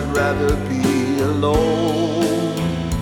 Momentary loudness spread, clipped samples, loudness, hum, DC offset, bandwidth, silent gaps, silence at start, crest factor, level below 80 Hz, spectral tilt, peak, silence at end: 4 LU; under 0.1%; -19 LUFS; none; under 0.1%; 19 kHz; none; 0 s; 14 dB; -32 dBFS; -6 dB/octave; -4 dBFS; 0 s